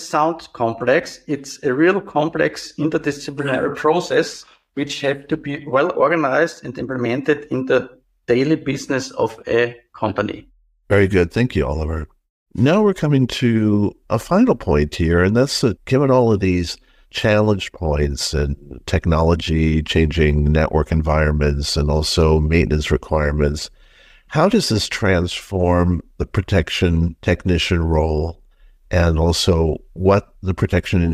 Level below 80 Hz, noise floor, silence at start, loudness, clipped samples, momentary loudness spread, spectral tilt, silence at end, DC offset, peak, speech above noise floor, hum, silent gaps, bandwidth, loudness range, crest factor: -30 dBFS; -49 dBFS; 0 s; -18 LUFS; under 0.1%; 9 LU; -6 dB/octave; 0 s; under 0.1%; -4 dBFS; 31 dB; none; 12.30-12.46 s; 14.5 kHz; 3 LU; 14 dB